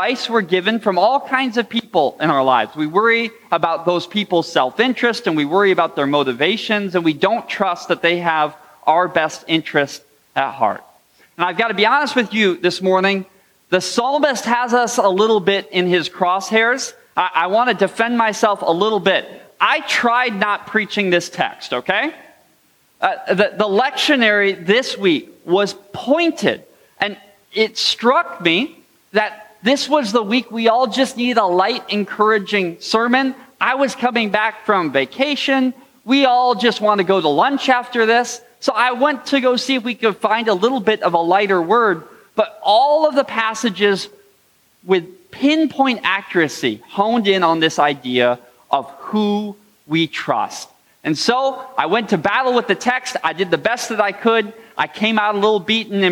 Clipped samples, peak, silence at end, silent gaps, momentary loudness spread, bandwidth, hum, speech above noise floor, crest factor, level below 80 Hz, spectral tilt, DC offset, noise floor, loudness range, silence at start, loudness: under 0.1%; 0 dBFS; 0 s; none; 7 LU; 19 kHz; none; 40 dB; 16 dB; -68 dBFS; -4 dB/octave; under 0.1%; -57 dBFS; 3 LU; 0 s; -17 LUFS